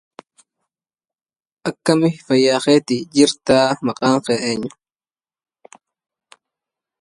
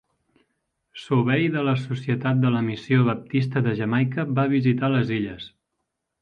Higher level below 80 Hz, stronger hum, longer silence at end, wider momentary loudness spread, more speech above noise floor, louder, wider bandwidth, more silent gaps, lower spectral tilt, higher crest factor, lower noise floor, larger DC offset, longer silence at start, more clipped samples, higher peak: about the same, -60 dBFS vs -60 dBFS; neither; first, 2.3 s vs 0.75 s; about the same, 10 LU vs 8 LU; first, over 74 dB vs 57 dB; first, -17 LUFS vs -23 LUFS; first, 11.5 kHz vs 6.6 kHz; neither; second, -4.5 dB/octave vs -8.5 dB/octave; about the same, 20 dB vs 16 dB; first, under -90 dBFS vs -79 dBFS; neither; first, 1.65 s vs 0.95 s; neither; first, 0 dBFS vs -8 dBFS